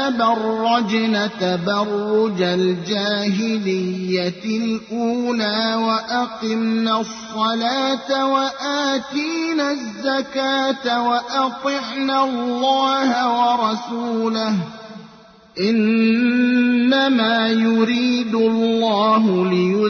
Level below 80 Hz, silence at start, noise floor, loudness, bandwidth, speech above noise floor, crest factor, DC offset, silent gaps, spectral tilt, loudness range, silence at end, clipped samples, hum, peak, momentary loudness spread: -62 dBFS; 0 s; -46 dBFS; -19 LUFS; 6.6 kHz; 27 dB; 14 dB; under 0.1%; none; -5 dB/octave; 4 LU; 0 s; under 0.1%; none; -6 dBFS; 7 LU